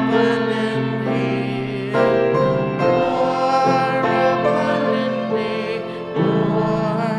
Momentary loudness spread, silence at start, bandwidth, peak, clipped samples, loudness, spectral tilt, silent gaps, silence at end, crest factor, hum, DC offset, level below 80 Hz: 6 LU; 0 s; 11 kHz; -4 dBFS; under 0.1%; -19 LUFS; -7 dB/octave; none; 0 s; 14 dB; none; under 0.1%; -52 dBFS